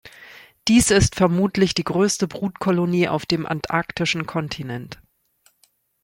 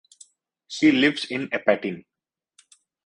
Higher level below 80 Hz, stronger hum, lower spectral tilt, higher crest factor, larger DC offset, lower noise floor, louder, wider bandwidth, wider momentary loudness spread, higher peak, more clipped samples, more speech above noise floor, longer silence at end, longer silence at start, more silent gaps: first, -42 dBFS vs -68 dBFS; neither; about the same, -4.5 dB/octave vs -4.5 dB/octave; about the same, 18 dB vs 22 dB; neither; about the same, -63 dBFS vs -62 dBFS; about the same, -21 LUFS vs -22 LUFS; first, 16.5 kHz vs 10.5 kHz; second, 12 LU vs 17 LU; about the same, -4 dBFS vs -4 dBFS; neither; about the same, 43 dB vs 40 dB; about the same, 1.1 s vs 1.05 s; second, 0.05 s vs 0.7 s; neither